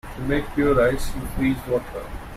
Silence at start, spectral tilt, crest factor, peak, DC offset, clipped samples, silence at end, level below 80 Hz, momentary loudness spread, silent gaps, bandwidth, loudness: 0.05 s; -6.5 dB/octave; 16 dB; -6 dBFS; under 0.1%; under 0.1%; 0 s; -34 dBFS; 12 LU; none; 15.5 kHz; -23 LUFS